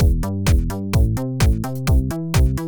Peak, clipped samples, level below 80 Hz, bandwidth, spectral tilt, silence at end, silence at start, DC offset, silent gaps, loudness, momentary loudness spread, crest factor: -6 dBFS; under 0.1%; -20 dBFS; over 20 kHz; -6.5 dB/octave; 0 s; 0 s; under 0.1%; none; -20 LUFS; 2 LU; 12 dB